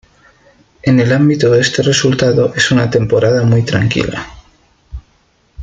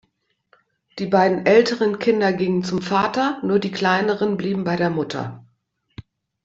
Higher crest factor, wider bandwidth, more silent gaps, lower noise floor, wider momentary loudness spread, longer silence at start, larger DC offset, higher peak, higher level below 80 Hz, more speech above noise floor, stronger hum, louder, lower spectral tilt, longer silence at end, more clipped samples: second, 12 dB vs 18 dB; first, 9.2 kHz vs 7.8 kHz; neither; second, -55 dBFS vs -69 dBFS; second, 7 LU vs 10 LU; about the same, 0.85 s vs 0.95 s; neither; first, 0 dBFS vs -4 dBFS; first, -40 dBFS vs -60 dBFS; second, 43 dB vs 50 dB; neither; first, -12 LUFS vs -20 LUFS; about the same, -5.5 dB/octave vs -6 dB/octave; second, 0 s vs 0.45 s; neither